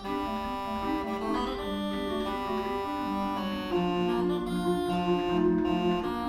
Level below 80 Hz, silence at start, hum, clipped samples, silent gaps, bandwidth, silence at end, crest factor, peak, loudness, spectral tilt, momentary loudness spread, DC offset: -48 dBFS; 0 s; none; under 0.1%; none; 15.5 kHz; 0 s; 14 dB; -16 dBFS; -30 LUFS; -6.5 dB/octave; 6 LU; under 0.1%